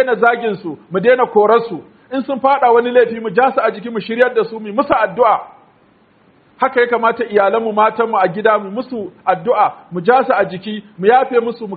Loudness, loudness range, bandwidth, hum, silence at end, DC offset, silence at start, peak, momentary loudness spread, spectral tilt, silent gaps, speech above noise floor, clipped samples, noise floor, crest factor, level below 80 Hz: -15 LUFS; 3 LU; 4.8 kHz; none; 0 s; under 0.1%; 0 s; 0 dBFS; 11 LU; -3.5 dB/octave; none; 37 dB; under 0.1%; -52 dBFS; 14 dB; -60 dBFS